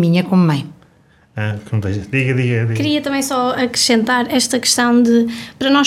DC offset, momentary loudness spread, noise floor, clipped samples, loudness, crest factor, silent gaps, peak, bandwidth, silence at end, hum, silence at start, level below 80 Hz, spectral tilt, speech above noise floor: under 0.1%; 10 LU; -51 dBFS; under 0.1%; -16 LUFS; 14 dB; none; -2 dBFS; 16 kHz; 0 s; none; 0 s; -52 dBFS; -4.5 dB/octave; 36 dB